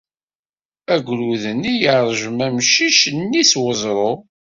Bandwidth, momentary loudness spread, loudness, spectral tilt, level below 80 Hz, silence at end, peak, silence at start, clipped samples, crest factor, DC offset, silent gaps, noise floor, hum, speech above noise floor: 7.8 kHz; 8 LU; -16 LUFS; -2.5 dB/octave; -58 dBFS; 0.3 s; 0 dBFS; 0.9 s; under 0.1%; 18 dB; under 0.1%; none; under -90 dBFS; none; over 73 dB